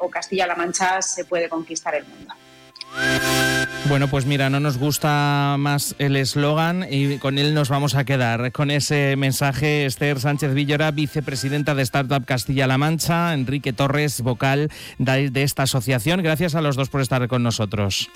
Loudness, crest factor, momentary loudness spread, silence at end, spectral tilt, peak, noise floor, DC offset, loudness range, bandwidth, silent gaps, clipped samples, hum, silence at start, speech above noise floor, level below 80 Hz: -20 LUFS; 10 dB; 5 LU; 0.1 s; -5 dB/octave; -12 dBFS; -41 dBFS; under 0.1%; 2 LU; 16.5 kHz; none; under 0.1%; none; 0 s; 21 dB; -48 dBFS